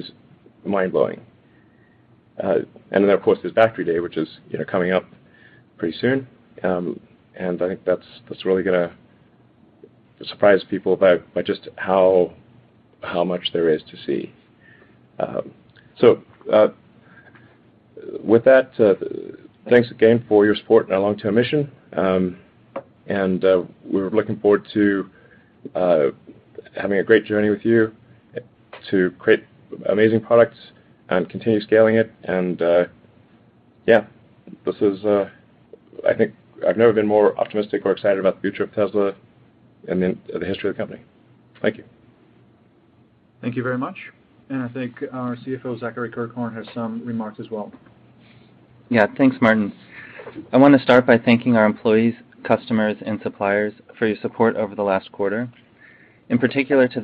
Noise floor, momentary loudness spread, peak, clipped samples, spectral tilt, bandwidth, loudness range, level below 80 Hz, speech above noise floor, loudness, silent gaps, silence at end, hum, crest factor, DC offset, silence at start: -55 dBFS; 15 LU; 0 dBFS; under 0.1%; -9 dB/octave; 5 kHz; 11 LU; -62 dBFS; 36 dB; -20 LUFS; none; 0 s; none; 20 dB; under 0.1%; 0 s